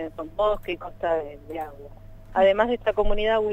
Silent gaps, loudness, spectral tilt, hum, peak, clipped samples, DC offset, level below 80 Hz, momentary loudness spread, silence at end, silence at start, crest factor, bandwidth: none; -25 LUFS; -6.5 dB/octave; none; -6 dBFS; under 0.1%; under 0.1%; -36 dBFS; 15 LU; 0 s; 0 s; 18 dB; 7.8 kHz